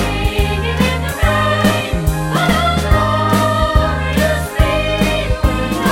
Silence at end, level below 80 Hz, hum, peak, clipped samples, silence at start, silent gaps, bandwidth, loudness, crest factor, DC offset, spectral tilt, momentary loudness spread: 0 s; -20 dBFS; none; 0 dBFS; under 0.1%; 0 s; none; 16.5 kHz; -15 LUFS; 14 dB; under 0.1%; -5.5 dB/octave; 3 LU